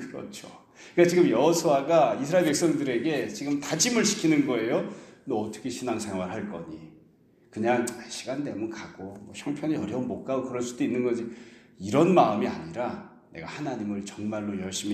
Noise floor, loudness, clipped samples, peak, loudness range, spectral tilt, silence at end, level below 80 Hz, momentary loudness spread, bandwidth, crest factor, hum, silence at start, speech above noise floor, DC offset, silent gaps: -59 dBFS; -26 LUFS; under 0.1%; -6 dBFS; 8 LU; -4.5 dB/octave; 0 s; -66 dBFS; 18 LU; 14.5 kHz; 22 dB; none; 0 s; 33 dB; under 0.1%; none